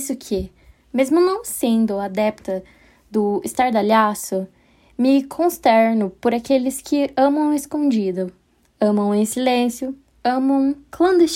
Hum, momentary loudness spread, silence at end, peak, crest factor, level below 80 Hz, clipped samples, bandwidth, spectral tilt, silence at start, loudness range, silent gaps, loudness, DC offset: none; 11 LU; 0 s; -4 dBFS; 16 dB; -52 dBFS; under 0.1%; 16.5 kHz; -5 dB/octave; 0 s; 3 LU; none; -19 LUFS; under 0.1%